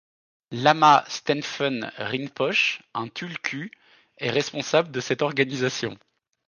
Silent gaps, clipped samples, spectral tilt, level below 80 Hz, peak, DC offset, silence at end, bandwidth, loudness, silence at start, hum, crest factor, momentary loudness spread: none; under 0.1%; -4 dB/octave; -72 dBFS; -4 dBFS; under 0.1%; 0.55 s; 10 kHz; -24 LUFS; 0.5 s; none; 22 dB; 14 LU